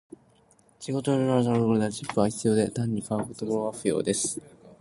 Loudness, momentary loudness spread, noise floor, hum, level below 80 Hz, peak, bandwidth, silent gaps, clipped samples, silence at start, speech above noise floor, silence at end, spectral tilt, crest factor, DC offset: -26 LUFS; 7 LU; -61 dBFS; none; -60 dBFS; -8 dBFS; 11.5 kHz; none; under 0.1%; 0.8 s; 35 dB; 0.05 s; -5.5 dB/octave; 20 dB; under 0.1%